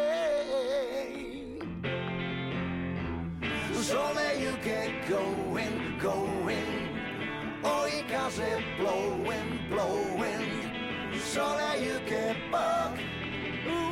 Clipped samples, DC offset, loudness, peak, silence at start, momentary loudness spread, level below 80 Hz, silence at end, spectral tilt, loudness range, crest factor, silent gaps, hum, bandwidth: under 0.1%; under 0.1%; -32 LUFS; -20 dBFS; 0 s; 6 LU; -54 dBFS; 0 s; -4.5 dB/octave; 2 LU; 12 dB; none; none; 16 kHz